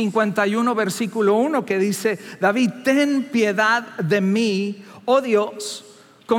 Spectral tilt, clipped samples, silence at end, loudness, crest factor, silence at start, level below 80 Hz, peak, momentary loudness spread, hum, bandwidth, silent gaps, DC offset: -5 dB/octave; under 0.1%; 0 s; -20 LUFS; 16 dB; 0 s; -80 dBFS; -4 dBFS; 7 LU; none; 17 kHz; none; under 0.1%